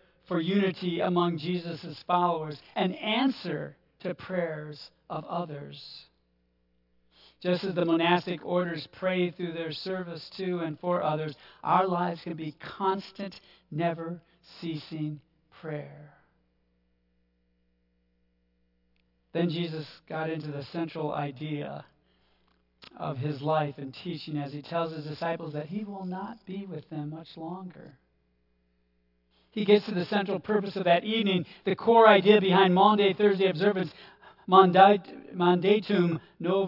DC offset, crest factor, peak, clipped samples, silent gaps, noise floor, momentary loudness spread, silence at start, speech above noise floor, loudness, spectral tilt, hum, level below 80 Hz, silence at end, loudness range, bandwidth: under 0.1%; 24 dB; -4 dBFS; under 0.1%; none; -72 dBFS; 19 LU; 0.3 s; 44 dB; -27 LUFS; -8 dB/octave; 60 Hz at -60 dBFS; -74 dBFS; 0 s; 17 LU; 5.8 kHz